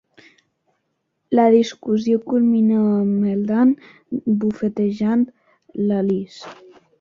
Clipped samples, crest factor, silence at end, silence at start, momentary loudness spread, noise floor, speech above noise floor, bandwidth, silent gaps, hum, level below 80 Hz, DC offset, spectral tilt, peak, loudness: under 0.1%; 16 dB; 0.45 s; 1.3 s; 12 LU; -73 dBFS; 55 dB; 7.2 kHz; none; none; -62 dBFS; under 0.1%; -8 dB/octave; -4 dBFS; -19 LUFS